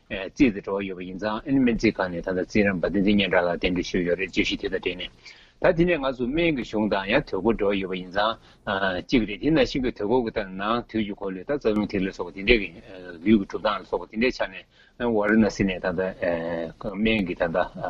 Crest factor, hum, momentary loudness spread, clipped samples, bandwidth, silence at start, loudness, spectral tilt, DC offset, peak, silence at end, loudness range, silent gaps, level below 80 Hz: 22 dB; none; 9 LU; under 0.1%; 7.6 kHz; 0.1 s; -25 LUFS; -6 dB/octave; under 0.1%; -2 dBFS; 0 s; 2 LU; none; -42 dBFS